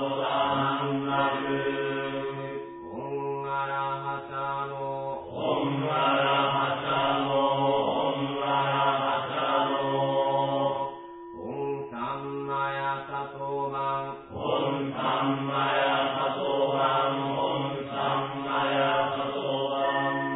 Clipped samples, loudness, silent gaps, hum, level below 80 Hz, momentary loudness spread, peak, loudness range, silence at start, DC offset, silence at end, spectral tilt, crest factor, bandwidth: under 0.1%; -28 LUFS; none; none; -64 dBFS; 9 LU; -12 dBFS; 6 LU; 0 s; under 0.1%; 0 s; -9.5 dB/octave; 16 dB; 4.1 kHz